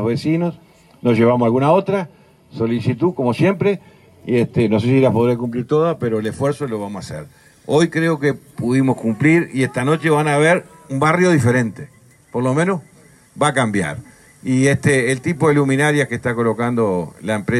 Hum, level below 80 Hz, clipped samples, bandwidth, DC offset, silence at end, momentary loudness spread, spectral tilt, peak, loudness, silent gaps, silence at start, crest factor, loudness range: none; -54 dBFS; under 0.1%; 12.5 kHz; under 0.1%; 0 s; 12 LU; -6.5 dB/octave; -4 dBFS; -17 LUFS; none; 0 s; 14 dB; 3 LU